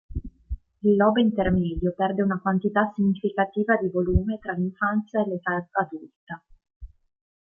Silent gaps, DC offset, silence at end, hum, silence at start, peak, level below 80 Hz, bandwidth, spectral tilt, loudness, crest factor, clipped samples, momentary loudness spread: 6.16-6.27 s, 6.76-6.80 s; under 0.1%; 0.65 s; none; 0.1 s; -6 dBFS; -40 dBFS; 3.6 kHz; -10 dB/octave; -24 LUFS; 18 dB; under 0.1%; 19 LU